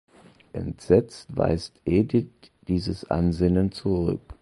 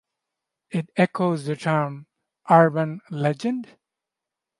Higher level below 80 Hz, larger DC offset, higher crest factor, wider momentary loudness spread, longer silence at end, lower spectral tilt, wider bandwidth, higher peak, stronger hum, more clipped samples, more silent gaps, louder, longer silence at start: first, -40 dBFS vs -70 dBFS; neither; about the same, 20 dB vs 22 dB; about the same, 13 LU vs 14 LU; second, 0.1 s vs 0.95 s; about the same, -8 dB/octave vs -7.5 dB/octave; about the same, 11.5 kHz vs 11.5 kHz; about the same, -4 dBFS vs -2 dBFS; neither; neither; neither; about the same, -25 LUFS vs -23 LUFS; second, 0.55 s vs 0.75 s